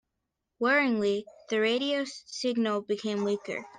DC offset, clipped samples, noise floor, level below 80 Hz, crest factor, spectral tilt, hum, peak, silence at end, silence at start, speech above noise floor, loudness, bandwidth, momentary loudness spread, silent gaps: under 0.1%; under 0.1%; -84 dBFS; -76 dBFS; 16 dB; -4 dB/octave; none; -14 dBFS; 0 s; 0.6 s; 55 dB; -29 LUFS; 9.6 kHz; 9 LU; none